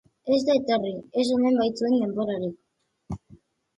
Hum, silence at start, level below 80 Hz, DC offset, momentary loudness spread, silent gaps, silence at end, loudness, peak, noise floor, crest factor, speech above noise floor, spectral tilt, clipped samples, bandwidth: none; 0.25 s; -58 dBFS; under 0.1%; 17 LU; none; 0.6 s; -24 LUFS; -10 dBFS; -55 dBFS; 16 dB; 32 dB; -6 dB/octave; under 0.1%; 11 kHz